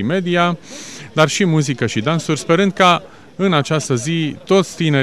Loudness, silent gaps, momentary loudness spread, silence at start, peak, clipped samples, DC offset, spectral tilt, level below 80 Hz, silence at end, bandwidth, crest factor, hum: -16 LUFS; none; 9 LU; 0 s; 0 dBFS; under 0.1%; 0.5%; -5 dB/octave; -56 dBFS; 0 s; 13.5 kHz; 16 dB; none